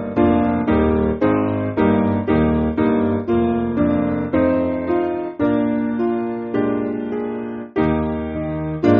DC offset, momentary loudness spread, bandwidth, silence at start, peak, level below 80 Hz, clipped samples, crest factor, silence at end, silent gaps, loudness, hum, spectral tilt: under 0.1%; 7 LU; 5.2 kHz; 0 s; -2 dBFS; -36 dBFS; under 0.1%; 16 dB; 0 s; none; -19 LUFS; none; -7.5 dB/octave